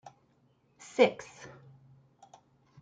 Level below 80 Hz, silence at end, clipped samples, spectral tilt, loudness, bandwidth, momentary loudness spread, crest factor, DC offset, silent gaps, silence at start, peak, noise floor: -78 dBFS; 1.6 s; under 0.1%; -4.5 dB/octave; -28 LUFS; 9.2 kHz; 25 LU; 24 dB; under 0.1%; none; 1 s; -10 dBFS; -69 dBFS